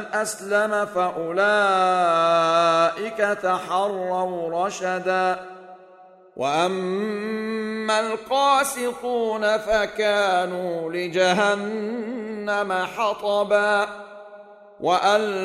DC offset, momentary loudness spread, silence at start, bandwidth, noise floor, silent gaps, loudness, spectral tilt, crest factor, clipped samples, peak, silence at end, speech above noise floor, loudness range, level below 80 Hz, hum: under 0.1%; 9 LU; 0 s; 15.5 kHz; -49 dBFS; none; -22 LUFS; -3.5 dB/octave; 16 dB; under 0.1%; -6 dBFS; 0 s; 27 dB; 5 LU; -60 dBFS; none